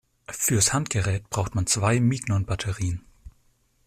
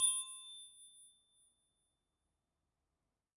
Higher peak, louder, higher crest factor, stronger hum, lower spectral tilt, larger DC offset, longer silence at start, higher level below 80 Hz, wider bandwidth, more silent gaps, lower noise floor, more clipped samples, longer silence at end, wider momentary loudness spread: first, -8 dBFS vs -20 dBFS; first, -24 LUFS vs -39 LUFS; second, 18 dB vs 24 dB; neither; first, -4 dB/octave vs 6 dB/octave; neither; first, 0.3 s vs 0 s; first, -48 dBFS vs under -90 dBFS; first, 16 kHz vs 11.5 kHz; neither; second, -64 dBFS vs -89 dBFS; neither; second, 0.55 s vs 2.3 s; second, 9 LU vs 23 LU